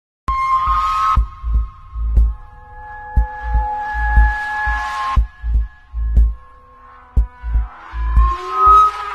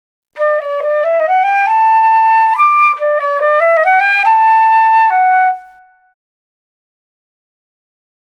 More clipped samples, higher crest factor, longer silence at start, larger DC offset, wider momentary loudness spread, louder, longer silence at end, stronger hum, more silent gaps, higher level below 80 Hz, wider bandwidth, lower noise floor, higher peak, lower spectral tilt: neither; first, 16 dB vs 10 dB; about the same, 0.3 s vs 0.35 s; neither; first, 13 LU vs 7 LU; second, -18 LUFS vs -10 LUFS; second, 0 s vs 2.65 s; neither; neither; first, -20 dBFS vs -72 dBFS; second, 6.8 kHz vs 9 kHz; about the same, -42 dBFS vs -43 dBFS; about the same, 0 dBFS vs -2 dBFS; first, -6 dB/octave vs 0.5 dB/octave